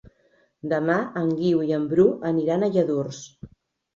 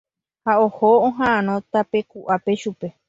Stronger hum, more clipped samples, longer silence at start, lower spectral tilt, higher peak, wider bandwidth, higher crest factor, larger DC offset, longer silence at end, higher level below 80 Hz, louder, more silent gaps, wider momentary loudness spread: neither; neither; first, 0.65 s vs 0.45 s; about the same, -7.5 dB/octave vs -6.5 dB/octave; about the same, -6 dBFS vs -4 dBFS; about the same, 7.6 kHz vs 7.8 kHz; about the same, 18 dB vs 16 dB; neither; first, 0.5 s vs 0.2 s; about the same, -60 dBFS vs -60 dBFS; second, -23 LUFS vs -20 LUFS; neither; first, 14 LU vs 9 LU